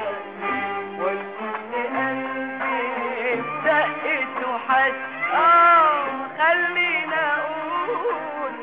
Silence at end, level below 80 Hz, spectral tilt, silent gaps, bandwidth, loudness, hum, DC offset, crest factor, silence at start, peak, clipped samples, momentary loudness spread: 0 s; -72 dBFS; -6.5 dB/octave; none; 4 kHz; -21 LUFS; none; 0.2%; 14 dB; 0 s; -8 dBFS; under 0.1%; 12 LU